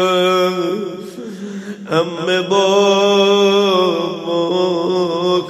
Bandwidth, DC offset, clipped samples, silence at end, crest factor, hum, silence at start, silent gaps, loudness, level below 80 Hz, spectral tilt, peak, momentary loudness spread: 13.5 kHz; under 0.1%; under 0.1%; 0 s; 14 dB; none; 0 s; none; -15 LUFS; -66 dBFS; -4.5 dB/octave; -2 dBFS; 16 LU